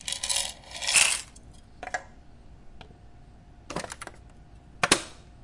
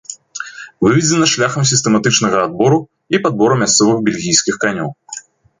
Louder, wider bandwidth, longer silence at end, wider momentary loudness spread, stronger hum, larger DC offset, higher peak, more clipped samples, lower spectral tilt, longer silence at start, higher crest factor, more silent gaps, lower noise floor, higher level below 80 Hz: second, -26 LUFS vs -13 LUFS; first, 11.5 kHz vs 9.8 kHz; second, 0.05 s vs 0.4 s; first, 23 LU vs 17 LU; neither; neither; about the same, -2 dBFS vs 0 dBFS; neither; second, -0.5 dB/octave vs -3.5 dB/octave; about the same, 0 s vs 0.1 s; first, 30 dB vs 14 dB; neither; first, -50 dBFS vs -34 dBFS; about the same, -52 dBFS vs -52 dBFS